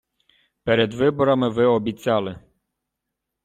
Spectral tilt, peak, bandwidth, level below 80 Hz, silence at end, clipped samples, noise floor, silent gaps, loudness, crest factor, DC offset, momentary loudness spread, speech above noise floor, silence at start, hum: -7 dB/octave; -6 dBFS; 13.5 kHz; -56 dBFS; 1.05 s; under 0.1%; -82 dBFS; none; -21 LUFS; 18 dB; under 0.1%; 6 LU; 62 dB; 0.65 s; none